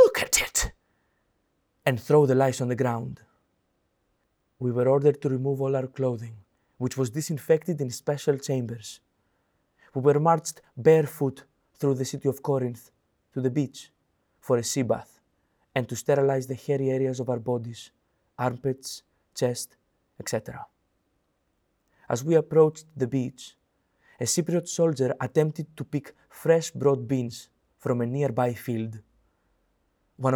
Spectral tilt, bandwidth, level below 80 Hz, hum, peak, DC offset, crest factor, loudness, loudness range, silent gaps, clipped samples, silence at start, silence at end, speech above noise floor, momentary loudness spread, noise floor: -5.5 dB/octave; over 20 kHz; -54 dBFS; none; -6 dBFS; under 0.1%; 20 dB; -26 LUFS; 5 LU; none; under 0.1%; 0 s; 0 s; 48 dB; 15 LU; -73 dBFS